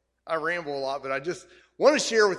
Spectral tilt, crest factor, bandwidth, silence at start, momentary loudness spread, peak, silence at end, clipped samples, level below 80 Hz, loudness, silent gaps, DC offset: -2.5 dB/octave; 20 dB; 12 kHz; 0.25 s; 11 LU; -6 dBFS; 0 s; under 0.1%; -68 dBFS; -26 LUFS; none; under 0.1%